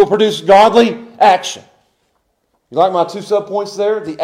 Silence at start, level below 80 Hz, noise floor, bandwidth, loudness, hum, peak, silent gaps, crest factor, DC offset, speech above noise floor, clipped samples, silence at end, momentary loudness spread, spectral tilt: 0 s; -56 dBFS; -64 dBFS; 14.5 kHz; -13 LUFS; none; 0 dBFS; none; 14 dB; under 0.1%; 52 dB; under 0.1%; 0 s; 13 LU; -4.5 dB/octave